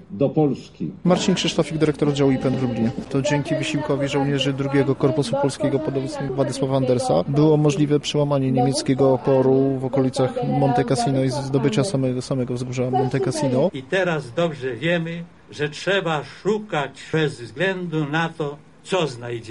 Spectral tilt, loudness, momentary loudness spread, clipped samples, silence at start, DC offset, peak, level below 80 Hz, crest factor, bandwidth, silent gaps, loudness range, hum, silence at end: -6 dB/octave; -21 LUFS; 7 LU; under 0.1%; 0 s; 0.2%; -6 dBFS; -52 dBFS; 14 dB; 11.5 kHz; none; 5 LU; none; 0 s